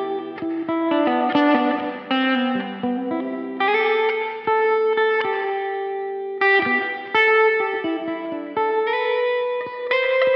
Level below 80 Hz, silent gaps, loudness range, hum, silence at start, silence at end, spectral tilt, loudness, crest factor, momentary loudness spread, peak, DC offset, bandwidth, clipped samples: -72 dBFS; none; 2 LU; none; 0 s; 0 s; -6 dB/octave; -21 LUFS; 16 dB; 10 LU; -4 dBFS; under 0.1%; 6 kHz; under 0.1%